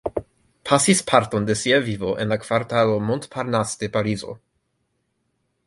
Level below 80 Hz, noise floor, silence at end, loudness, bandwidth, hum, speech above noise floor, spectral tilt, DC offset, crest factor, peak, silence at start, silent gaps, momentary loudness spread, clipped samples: -52 dBFS; -72 dBFS; 1.3 s; -21 LUFS; 11.5 kHz; none; 51 dB; -4.5 dB/octave; under 0.1%; 22 dB; 0 dBFS; 0.05 s; none; 13 LU; under 0.1%